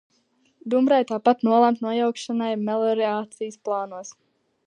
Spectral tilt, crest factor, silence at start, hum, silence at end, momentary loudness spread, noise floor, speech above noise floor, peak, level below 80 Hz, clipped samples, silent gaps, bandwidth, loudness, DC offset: -5.5 dB/octave; 18 dB; 0.65 s; none; 0.55 s; 15 LU; -66 dBFS; 43 dB; -4 dBFS; -80 dBFS; under 0.1%; none; 10 kHz; -23 LUFS; under 0.1%